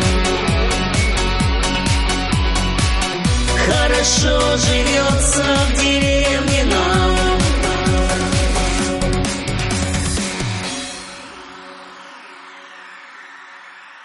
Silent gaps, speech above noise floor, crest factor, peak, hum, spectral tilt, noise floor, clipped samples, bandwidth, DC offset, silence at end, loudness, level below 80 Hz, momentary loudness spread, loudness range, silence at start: none; 24 dB; 14 dB; -4 dBFS; none; -4 dB/octave; -39 dBFS; under 0.1%; 11.5 kHz; under 0.1%; 0 s; -16 LUFS; -22 dBFS; 22 LU; 10 LU; 0 s